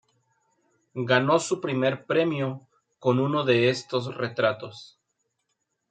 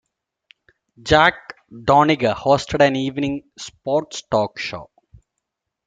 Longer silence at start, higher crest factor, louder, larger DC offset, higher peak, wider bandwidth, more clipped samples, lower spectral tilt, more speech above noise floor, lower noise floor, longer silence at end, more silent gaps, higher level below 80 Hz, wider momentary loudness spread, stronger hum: about the same, 0.95 s vs 1.05 s; about the same, 22 dB vs 20 dB; second, -25 LUFS vs -19 LUFS; neither; about the same, -4 dBFS vs -2 dBFS; about the same, 9.4 kHz vs 9.2 kHz; neither; about the same, -5.5 dB/octave vs -5 dB/octave; second, 53 dB vs 61 dB; about the same, -78 dBFS vs -79 dBFS; about the same, 1.05 s vs 1 s; neither; second, -72 dBFS vs -46 dBFS; second, 15 LU vs 20 LU; neither